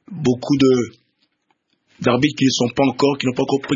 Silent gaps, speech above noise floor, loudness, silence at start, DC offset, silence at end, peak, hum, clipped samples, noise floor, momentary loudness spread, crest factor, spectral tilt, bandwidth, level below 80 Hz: none; 50 dB; -18 LUFS; 0.1 s; under 0.1%; 0 s; -2 dBFS; none; under 0.1%; -67 dBFS; 5 LU; 18 dB; -5.5 dB/octave; 7.6 kHz; -54 dBFS